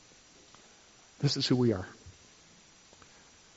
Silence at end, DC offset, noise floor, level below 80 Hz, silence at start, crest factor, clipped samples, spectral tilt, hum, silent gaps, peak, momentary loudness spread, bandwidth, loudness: 1.45 s; under 0.1%; -59 dBFS; -66 dBFS; 1.2 s; 20 dB; under 0.1%; -5.5 dB/octave; none; none; -14 dBFS; 25 LU; 8 kHz; -30 LUFS